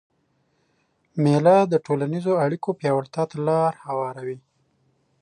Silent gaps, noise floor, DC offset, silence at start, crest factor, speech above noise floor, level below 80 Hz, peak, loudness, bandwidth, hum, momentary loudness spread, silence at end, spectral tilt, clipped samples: none; -68 dBFS; under 0.1%; 1.15 s; 18 dB; 47 dB; -72 dBFS; -6 dBFS; -22 LUFS; 10 kHz; none; 15 LU; 0.85 s; -8 dB/octave; under 0.1%